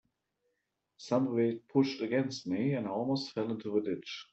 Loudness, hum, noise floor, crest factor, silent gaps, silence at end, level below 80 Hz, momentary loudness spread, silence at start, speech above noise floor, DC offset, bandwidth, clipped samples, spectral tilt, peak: -33 LUFS; none; -83 dBFS; 18 dB; none; 0.1 s; -76 dBFS; 6 LU; 1 s; 50 dB; under 0.1%; 8 kHz; under 0.1%; -6.5 dB/octave; -14 dBFS